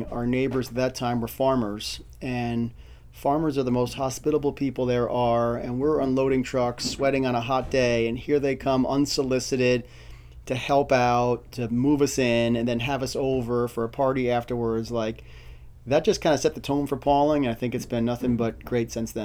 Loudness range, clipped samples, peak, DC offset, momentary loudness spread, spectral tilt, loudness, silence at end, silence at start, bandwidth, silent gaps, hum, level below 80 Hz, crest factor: 3 LU; under 0.1%; -8 dBFS; under 0.1%; 7 LU; -5.5 dB/octave; -25 LUFS; 0 s; 0 s; 16.5 kHz; none; none; -46 dBFS; 18 dB